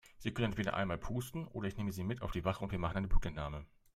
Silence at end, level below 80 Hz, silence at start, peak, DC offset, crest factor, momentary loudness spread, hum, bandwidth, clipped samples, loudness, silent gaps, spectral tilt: 0.3 s; -42 dBFS; 0.15 s; -18 dBFS; under 0.1%; 20 dB; 7 LU; none; 13.5 kHz; under 0.1%; -39 LUFS; none; -6.5 dB/octave